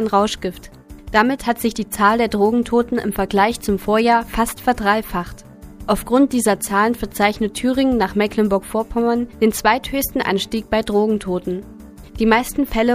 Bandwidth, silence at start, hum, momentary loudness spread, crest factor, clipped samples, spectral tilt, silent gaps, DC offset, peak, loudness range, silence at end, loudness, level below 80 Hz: 15.5 kHz; 0 s; none; 6 LU; 18 dB; under 0.1%; -4.5 dB/octave; none; under 0.1%; 0 dBFS; 2 LU; 0 s; -18 LUFS; -38 dBFS